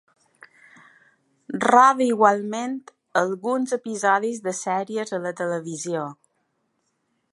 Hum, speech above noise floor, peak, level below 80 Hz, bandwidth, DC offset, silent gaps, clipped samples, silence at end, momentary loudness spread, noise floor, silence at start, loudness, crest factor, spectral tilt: none; 51 dB; -2 dBFS; -78 dBFS; 11.5 kHz; under 0.1%; none; under 0.1%; 1.2 s; 13 LU; -72 dBFS; 1.5 s; -22 LUFS; 22 dB; -4.5 dB/octave